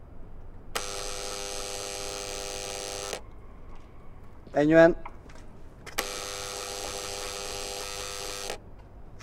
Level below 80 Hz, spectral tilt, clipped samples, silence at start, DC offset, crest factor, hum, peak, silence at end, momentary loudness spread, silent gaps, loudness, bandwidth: -46 dBFS; -3.5 dB/octave; under 0.1%; 0 s; under 0.1%; 26 dB; none; -6 dBFS; 0 s; 27 LU; none; -30 LUFS; 17.5 kHz